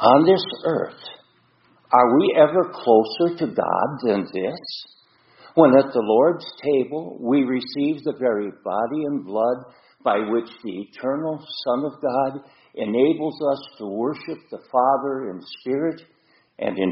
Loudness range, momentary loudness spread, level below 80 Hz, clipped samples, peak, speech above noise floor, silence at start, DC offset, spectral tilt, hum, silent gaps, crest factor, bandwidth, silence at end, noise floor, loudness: 6 LU; 16 LU; -68 dBFS; under 0.1%; 0 dBFS; 39 dB; 0 s; under 0.1%; -4.5 dB/octave; none; none; 22 dB; 5.8 kHz; 0 s; -59 dBFS; -21 LUFS